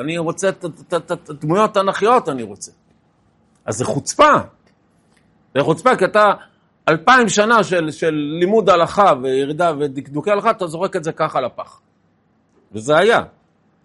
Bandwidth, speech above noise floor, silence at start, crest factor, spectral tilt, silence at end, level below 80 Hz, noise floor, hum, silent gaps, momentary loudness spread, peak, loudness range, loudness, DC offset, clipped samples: 11.5 kHz; 43 dB; 0 s; 18 dB; -4.5 dB/octave; 0.55 s; -56 dBFS; -60 dBFS; none; none; 15 LU; 0 dBFS; 6 LU; -16 LUFS; under 0.1%; under 0.1%